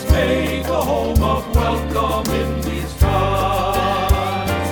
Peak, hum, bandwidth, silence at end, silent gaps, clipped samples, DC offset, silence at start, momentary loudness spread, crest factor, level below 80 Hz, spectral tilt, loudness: -2 dBFS; none; over 20 kHz; 0 s; none; under 0.1%; under 0.1%; 0 s; 4 LU; 16 dB; -24 dBFS; -6 dB/octave; -19 LUFS